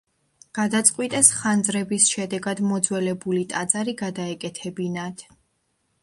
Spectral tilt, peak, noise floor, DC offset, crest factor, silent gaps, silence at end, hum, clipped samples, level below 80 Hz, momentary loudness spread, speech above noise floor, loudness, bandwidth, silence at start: -3 dB/octave; 0 dBFS; -71 dBFS; under 0.1%; 24 dB; none; 0.8 s; none; under 0.1%; -66 dBFS; 15 LU; 48 dB; -22 LUFS; 12 kHz; 0.55 s